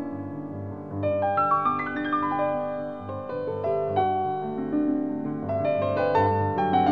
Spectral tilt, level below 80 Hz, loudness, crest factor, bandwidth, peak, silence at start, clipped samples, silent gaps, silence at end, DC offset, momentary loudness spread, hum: -9.5 dB/octave; -52 dBFS; -26 LUFS; 16 dB; 6 kHz; -10 dBFS; 0 s; under 0.1%; none; 0 s; 0.2%; 12 LU; none